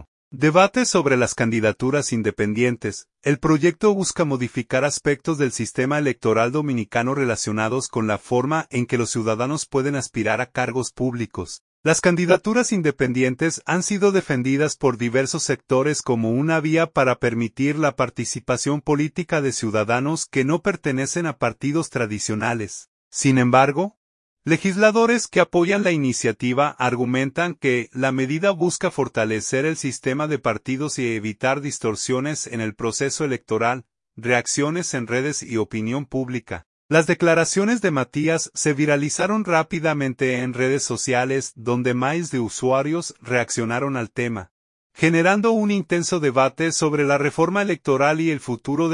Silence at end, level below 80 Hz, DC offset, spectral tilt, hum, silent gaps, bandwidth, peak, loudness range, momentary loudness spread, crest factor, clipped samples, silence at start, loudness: 0 s; -56 dBFS; under 0.1%; -5 dB/octave; none; 0.08-0.31 s, 11.61-11.83 s, 22.88-23.11 s, 23.97-24.37 s, 36.66-36.89 s, 44.51-44.90 s; 11 kHz; -2 dBFS; 4 LU; 7 LU; 18 dB; under 0.1%; 0 s; -21 LUFS